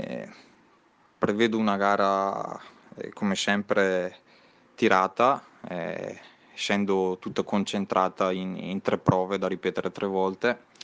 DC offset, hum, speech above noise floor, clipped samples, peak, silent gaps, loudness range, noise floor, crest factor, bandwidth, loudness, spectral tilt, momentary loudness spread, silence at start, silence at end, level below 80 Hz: under 0.1%; none; 36 dB; under 0.1%; -6 dBFS; none; 2 LU; -62 dBFS; 22 dB; 9.8 kHz; -26 LUFS; -5.5 dB/octave; 14 LU; 0 s; 0 s; -66 dBFS